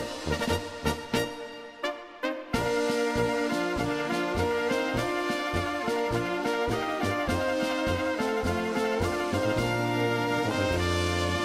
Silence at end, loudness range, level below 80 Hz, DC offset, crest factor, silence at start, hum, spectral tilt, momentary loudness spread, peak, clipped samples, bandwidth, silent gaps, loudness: 0 s; 2 LU; -46 dBFS; under 0.1%; 16 dB; 0 s; none; -5 dB/octave; 5 LU; -12 dBFS; under 0.1%; 16 kHz; none; -28 LUFS